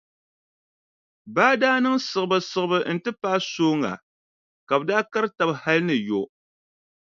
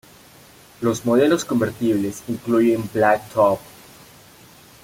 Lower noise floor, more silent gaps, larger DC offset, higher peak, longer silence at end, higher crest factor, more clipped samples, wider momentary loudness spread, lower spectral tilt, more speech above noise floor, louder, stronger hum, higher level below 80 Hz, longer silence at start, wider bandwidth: first, under -90 dBFS vs -48 dBFS; first, 4.03-4.67 s vs none; neither; about the same, -2 dBFS vs -2 dBFS; second, 0.8 s vs 1.2 s; about the same, 22 dB vs 18 dB; neither; about the same, 9 LU vs 8 LU; about the same, -5 dB/octave vs -5.5 dB/octave; first, over 68 dB vs 29 dB; second, -23 LUFS vs -20 LUFS; neither; second, -72 dBFS vs -56 dBFS; first, 1.25 s vs 0.8 s; second, 7.6 kHz vs 17 kHz